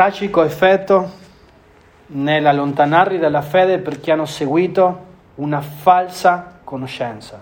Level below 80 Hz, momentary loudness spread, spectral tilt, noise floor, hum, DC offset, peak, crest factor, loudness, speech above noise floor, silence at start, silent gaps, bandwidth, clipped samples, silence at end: -54 dBFS; 14 LU; -6 dB/octave; -48 dBFS; none; under 0.1%; 0 dBFS; 16 dB; -16 LUFS; 32 dB; 0 s; none; 19.5 kHz; under 0.1%; 0 s